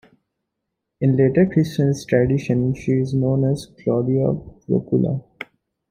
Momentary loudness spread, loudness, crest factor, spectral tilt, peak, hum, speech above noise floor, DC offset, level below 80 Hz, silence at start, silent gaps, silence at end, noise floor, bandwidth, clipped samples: 9 LU; -20 LUFS; 18 dB; -8.5 dB/octave; -2 dBFS; none; 60 dB; under 0.1%; -50 dBFS; 1 s; none; 0.45 s; -79 dBFS; 10.5 kHz; under 0.1%